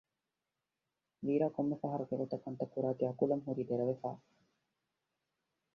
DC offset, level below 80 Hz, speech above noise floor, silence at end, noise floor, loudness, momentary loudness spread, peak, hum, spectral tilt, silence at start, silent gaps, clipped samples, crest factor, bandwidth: under 0.1%; -78 dBFS; 54 dB; 1.6 s; -90 dBFS; -37 LUFS; 8 LU; -18 dBFS; none; -10 dB/octave; 1.2 s; none; under 0.1%; 20 dB; 6.2 kHz